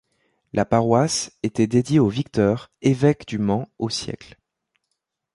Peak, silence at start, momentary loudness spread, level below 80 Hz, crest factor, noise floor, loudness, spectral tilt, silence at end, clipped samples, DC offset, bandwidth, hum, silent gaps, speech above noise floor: -2 dBFS; 0.55 s; 9 LU; -52 dBFS; 20 dB; -78 dBFS; -21 LUFS; -6 dB/octave; 1.1 s; under 0.1%; under 0.1%; 11.5 kHz; none; none; 57 dB